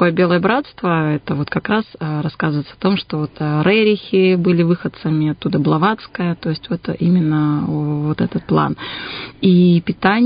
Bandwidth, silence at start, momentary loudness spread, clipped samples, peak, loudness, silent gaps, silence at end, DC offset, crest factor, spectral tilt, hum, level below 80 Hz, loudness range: 5.2 kHz; 0 s; 8 LU; under 0.1%; 0 dBFS; -17 LUFS; none; 0 s; under 0.1%; 16 dB; -12.5 dB/octave; none; -50 dBFS; 3 LU